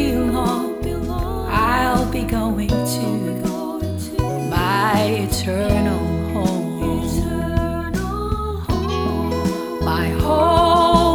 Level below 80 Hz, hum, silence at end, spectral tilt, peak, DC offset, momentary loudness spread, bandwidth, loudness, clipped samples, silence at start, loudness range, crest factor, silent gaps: -28 dBFS; none; 0 s; -6 dB/octave; 0 dBFS; under 0.1%; 8 LU; over 20 kHz; -20 LUFS; under 0.1%; 0 s; 2 LU; 18 dB; none